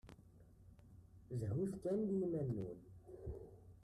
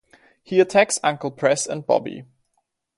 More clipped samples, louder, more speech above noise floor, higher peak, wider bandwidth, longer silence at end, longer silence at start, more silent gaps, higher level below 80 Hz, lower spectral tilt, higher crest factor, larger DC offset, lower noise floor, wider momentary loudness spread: neither; second, -43 LUFS vs -20 LUFS; second, 23 dB vs 53 dB; second, -30 dBFS vs -4 dBFS; first, 13 kHz vs 11.5 kHz; second, 0.05 s vs 0.75 s; second, 0.05 s vs 0.5 s; neither; about the same, -64 dBFS vs -68 dBFS; first, -9.5 dB/octave vs -3.5 dB/octave; about the same, 14 dB vs 18 dB; neither; second, -64 dBFS vs -73 dBFS; first, 24 LU vs 8 LU